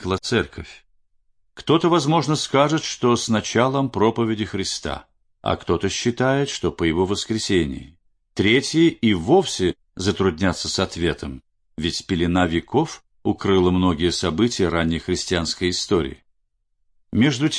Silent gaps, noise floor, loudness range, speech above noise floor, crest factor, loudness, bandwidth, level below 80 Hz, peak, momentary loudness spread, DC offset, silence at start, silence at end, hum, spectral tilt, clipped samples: none; -69 dBFS; 3 LU; 49 dB; 18 dB; -21 LUFS; 10.5 kHz; -44 dBFS; -4 dBFS; 10 LU; under 0.1%; 0 s; 0 s; none; -5 dB/octave; under 0.1%